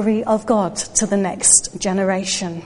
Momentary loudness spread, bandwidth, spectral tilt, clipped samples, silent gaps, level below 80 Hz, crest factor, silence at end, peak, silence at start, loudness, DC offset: 8 LU; 11.5 kHz; -3 dB/octave; under 0.1%; none; -48 dBFS; 18 dB; 0 s; 0 dBFS; 0 s; -17 LUFS; under 0.1%